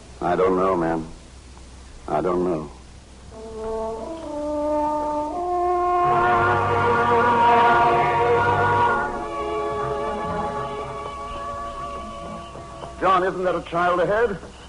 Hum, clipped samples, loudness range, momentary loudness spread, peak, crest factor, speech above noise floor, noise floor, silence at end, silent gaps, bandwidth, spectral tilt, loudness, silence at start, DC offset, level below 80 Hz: none; under 0.1%; 10 LU; 15 LU; -8 dBFS; 14 dB; 21 dB; -43 dBFS; 0 s; none; 11 kHz; -6 dB/octave; -21 LUFS; 0 s; under 0.1%; -44 dBFS